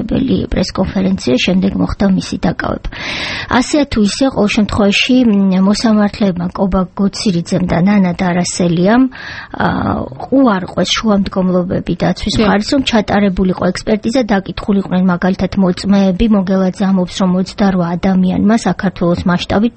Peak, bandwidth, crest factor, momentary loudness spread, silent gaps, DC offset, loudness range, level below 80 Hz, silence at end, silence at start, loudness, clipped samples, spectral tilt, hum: 0 dBFS; 8.8 kHz; 12 dB; 5 LU; none; under 0.1%; 2 LU; -32 dBFS; 0.05 s; 0 s; -13 LUFS; under 0.1%; -6 dB/octave; none